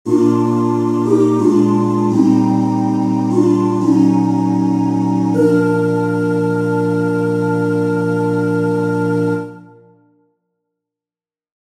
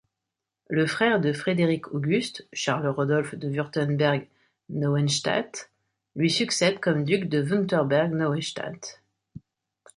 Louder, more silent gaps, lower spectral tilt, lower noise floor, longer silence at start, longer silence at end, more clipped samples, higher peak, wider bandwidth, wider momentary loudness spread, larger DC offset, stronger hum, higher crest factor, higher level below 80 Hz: first, -15 LUFS vs -25 LUFS; neither; first, -8.5 dB/octave vs -5 dB/octave; first, under -90 dBFS vs -86 dBFS; second, 0.05 s vs 0.7 s; first, 2.2 s vs 0.6 s; neither; first, 0 dBFS vs -8 dBFS; about the same, 11.5 kHz vs 11.5 kHz; second, 4 LU vs 10 LU; neither; neither; about the same, 14 dB vs 18 dB; about the same, -64 dBFS vs -68 dBFS